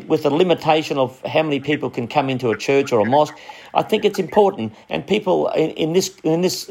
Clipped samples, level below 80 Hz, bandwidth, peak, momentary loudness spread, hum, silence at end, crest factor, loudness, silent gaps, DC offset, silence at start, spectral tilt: under 0.1%; -60 dBFS; 16.5 kHz; 0 dBFS; 6 LU; none; 0.05 s; 18 dB; -19 LUFS; none; under 0.1%; 0 s; -5 dB/octave